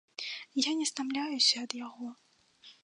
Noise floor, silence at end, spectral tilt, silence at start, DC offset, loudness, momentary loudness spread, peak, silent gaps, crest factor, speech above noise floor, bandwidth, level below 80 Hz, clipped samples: -59 dBFS; 0.1 s; 0 dB/octave; 0.2 s; under 0.1%; -30 LUFS; 17 LU; -12 dBFS; none; 22 dB; 27 dB; 11.5 kHz; -86 dBFS; under 0.1%